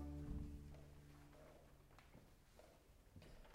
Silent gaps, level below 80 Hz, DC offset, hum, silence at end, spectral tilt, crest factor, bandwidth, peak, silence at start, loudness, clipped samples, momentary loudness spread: none; -60 dBFS; under 0.1%; none; 0 s; -7 dB/octave; 20 dB; 15.5 kHz; -38 dBFS; 0 s; -60 LUFS; under 0.1%; 16 LU